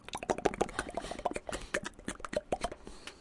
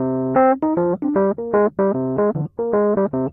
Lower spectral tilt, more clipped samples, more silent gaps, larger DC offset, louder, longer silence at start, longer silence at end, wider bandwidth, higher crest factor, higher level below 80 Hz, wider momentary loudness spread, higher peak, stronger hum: second, -3.5 dB/octave vs -13 dB/octave; neither; neither; neither; second, -37 LUFS vs -19 LUFS; about the same, 0.05 s vs 0 s; about the same, 0 s vs 0 s; first, 11.5 kHz vs 2.9 kHz; first, 26 dB vs 14 dB; about the same, -52 dBFS vs -54 dBFS; first, 9 LU vs 4 LU; second, -12 dBFS vs -6 dBFS; neither